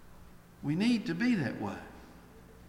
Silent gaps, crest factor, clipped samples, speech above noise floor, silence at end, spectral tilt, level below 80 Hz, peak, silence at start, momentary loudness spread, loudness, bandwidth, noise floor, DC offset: none; 16 dB; under 0.1%; 23 dB; 0 s; -6.5 dB/octave; -60 dBFS; -18 dBFS; 0 s; 18 LU; -32 LUFS; 13 kHz; -54 dBFS; under 0.1%